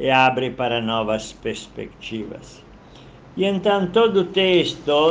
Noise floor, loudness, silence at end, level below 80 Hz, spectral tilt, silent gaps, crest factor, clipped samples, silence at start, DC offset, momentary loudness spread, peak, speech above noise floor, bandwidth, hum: -44 dBFS; -20 LUFS; 0 s; -50 dBFS; -5 dB/octave; none; 18 dB; under 0.1%; 0 s; under 0.1%; 16 LU; -4 dBFS; 24 dB; 9.4 kHz; none